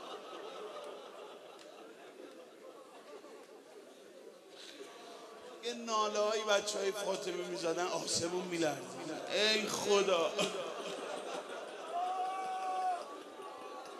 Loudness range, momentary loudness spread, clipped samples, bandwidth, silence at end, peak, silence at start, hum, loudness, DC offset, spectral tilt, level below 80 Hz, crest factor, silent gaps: 19 LU; 22 LU; under 0.1%; 13 kHz; 0 s; -16 dBFS; 0 s; none; -36 LUFS; under 0.1%; -2.5 dB/octave; -84 dBFS; 24 dB; none